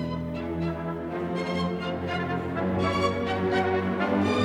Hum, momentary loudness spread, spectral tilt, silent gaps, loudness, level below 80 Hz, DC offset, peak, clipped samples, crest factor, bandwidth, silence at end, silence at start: none; 7 LU; -7 dB/octave; none; -28 LUFS; -54 dBFS; under 0.1%; -12 dBFS; under 0.1%; 16 dB; 11.5 kHz; 0 s; 0 s